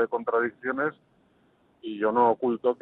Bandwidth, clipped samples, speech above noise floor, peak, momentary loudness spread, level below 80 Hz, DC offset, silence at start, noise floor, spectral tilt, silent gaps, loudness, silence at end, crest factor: 4 kHz; under 0.1%; 38 dB; -8 dBFS; 10 LU; -72 dBFS; under 0.1%; 0 s; -64 dBFS; -9 dB/octave; none; -26 LUFS; 0.1 s; 18 dB